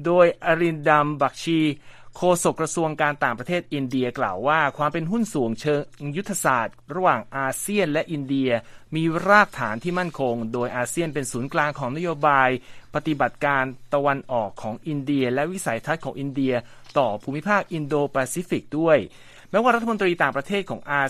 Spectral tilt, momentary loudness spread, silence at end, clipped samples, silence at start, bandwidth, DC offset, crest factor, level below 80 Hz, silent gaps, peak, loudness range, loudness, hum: -5 dB/octave; 8 LU; 0 s; under 0.1%; 0 s; 14.5 kHz; under 0.1%; 22 dB; -56 dBFS; none; -2 dBFS; 3 LU; -23 LUFS; none